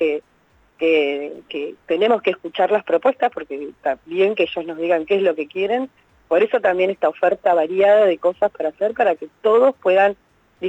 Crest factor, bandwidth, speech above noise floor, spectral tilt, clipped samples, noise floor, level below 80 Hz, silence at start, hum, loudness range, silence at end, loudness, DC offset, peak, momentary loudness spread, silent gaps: 14 dB; 8 kHz; 39 dB; -6 dB/octave; under 0.1%; -58 dBFS; -64 dBFS; 0 s; none; 4 LU; 0 s; -19 LUFS; under 0.1%; -6 dBFS; 11 LU; none